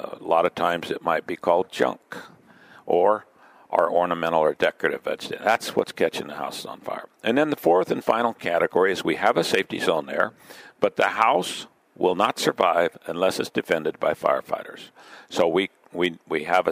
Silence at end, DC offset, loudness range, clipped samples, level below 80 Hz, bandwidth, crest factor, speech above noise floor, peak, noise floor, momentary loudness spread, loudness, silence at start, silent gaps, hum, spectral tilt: 0 s; under 0.1%; 3 LU; under 0.1%; -68 dBFS; 16 kHz; 22 dB; 28 dB; -2 dBFS; -51 dBFS; 11 LU; -23 LUFS; 0 s; none; none; -4 dB/octave